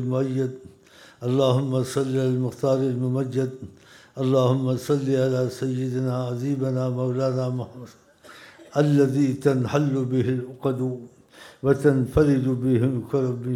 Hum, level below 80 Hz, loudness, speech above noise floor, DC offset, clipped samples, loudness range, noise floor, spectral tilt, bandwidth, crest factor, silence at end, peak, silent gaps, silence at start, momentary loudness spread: none; -50 dBFS; -23 LUFS; 28 dB; under 0.1%; under 0.1%; 2 LU; -51 dBFS; -8 dB/octave; 13.5 kHz; 18 dB; 0 s; -4 dBFS; none; 0 s; 9 LU